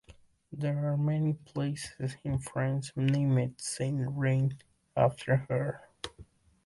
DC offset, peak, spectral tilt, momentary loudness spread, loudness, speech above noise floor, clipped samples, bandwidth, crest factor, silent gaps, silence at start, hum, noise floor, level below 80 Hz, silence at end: under 0.1%; -12 dBFS; -6.5 dB/octave; 11 LU; -31 LUFS; 28 dB; under 0.1%; 11.5 kHz; 18 dB; none; 0.1 s; none; -58 dBFS; -58 dBFS; 0.45 s